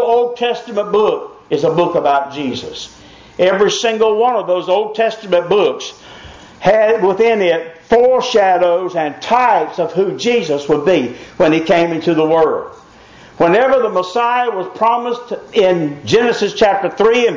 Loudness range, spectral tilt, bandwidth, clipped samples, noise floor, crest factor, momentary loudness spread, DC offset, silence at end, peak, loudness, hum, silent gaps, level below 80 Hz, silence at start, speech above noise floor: 2 LU; -5 dB/octave; 7.6 kHz; under 0.1%; -41 dBFS; 12 dB; 10 LU; under 0.1%; 0 s; -2 dBFS; -14 LUFS; none; none; -52 dBFS; 0 s; 27 dB